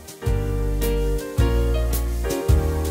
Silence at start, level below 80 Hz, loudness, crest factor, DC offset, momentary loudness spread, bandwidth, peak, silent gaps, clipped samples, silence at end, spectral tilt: 0 s; -24 dBFS; -23 LUFS; 14 dB; under 0.1%; 4 LU; 16 kHz; -6 dBFS; none; under 0.1%; 0 s; -6 dB/octave